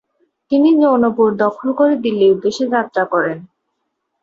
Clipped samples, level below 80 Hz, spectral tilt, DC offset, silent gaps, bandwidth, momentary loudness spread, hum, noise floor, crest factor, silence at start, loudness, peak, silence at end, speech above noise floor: under 0.1%; -60 dBFS; -6.5 dB/octave; under 0.1%; none; 7.6 kHz; 7 LU; none; -72 dBFS; 14 dB; 0.5 s; -15 LUFS; -2 dBFS; 0.8 s; 58 dB